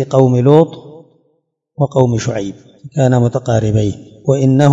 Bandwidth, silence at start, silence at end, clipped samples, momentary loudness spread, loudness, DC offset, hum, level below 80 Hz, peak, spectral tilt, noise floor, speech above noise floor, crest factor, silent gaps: 7.8 kHz; 0 s; 0 s; 0.3%; 12 LU; -14 LUFS; under 0.1%; none; -46 dBFS; 0 dBFS; -8 dB/octave; -64 dBFS; 51 dB; 14 dB; none